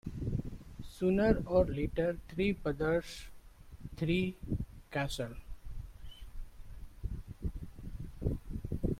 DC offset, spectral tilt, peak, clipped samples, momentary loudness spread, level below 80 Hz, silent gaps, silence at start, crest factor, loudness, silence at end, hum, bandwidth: under 0.1%; -7 dB/octave; -14 dBFS; under 0.1%; 22 LU; -44 dBFS; none; 0.05 s; 22 dB; -35 LUFS; 0 s; none; 16 kHz